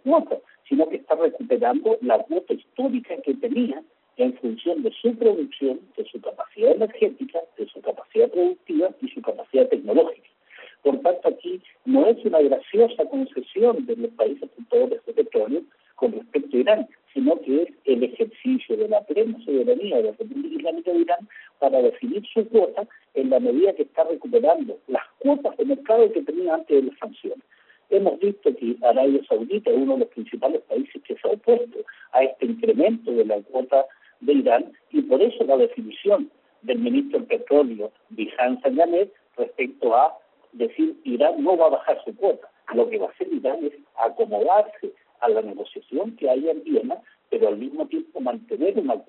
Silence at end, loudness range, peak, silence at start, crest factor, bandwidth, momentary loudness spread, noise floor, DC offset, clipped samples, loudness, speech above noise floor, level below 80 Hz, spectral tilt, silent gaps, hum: 0.05 s; 3 LU; -4 dBFS; 0.05 s; 18 dB; 4.2 kHz; 11 LU; -49 dBFS; under 0.1%; under 0.1%; -22 LUFS; 28 dB; -74 dBFS; -4 dB/octave; none; none